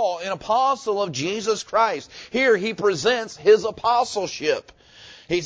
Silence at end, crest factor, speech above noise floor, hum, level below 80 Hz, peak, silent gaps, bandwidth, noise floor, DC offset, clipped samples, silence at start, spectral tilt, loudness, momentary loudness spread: 0 s; 18 dB; 25 dB; none; -58 dBFS; -4 dBFS; none; 8 kHz; -47 dBFS; under 0.1%; under 0.1%; 0 s; -3.5 dB/octave; -22 LUFS; 8 LU